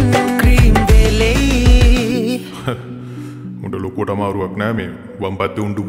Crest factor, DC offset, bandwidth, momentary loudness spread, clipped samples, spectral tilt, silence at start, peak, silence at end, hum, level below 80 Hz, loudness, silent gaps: 14 dB; under 0.1%; 16 kHz; 17 LU; under 0.1%; -6 dB/octave; 0 s; 0 dBFS; 0 s; none; -16 dBFS; -15 LUFS; none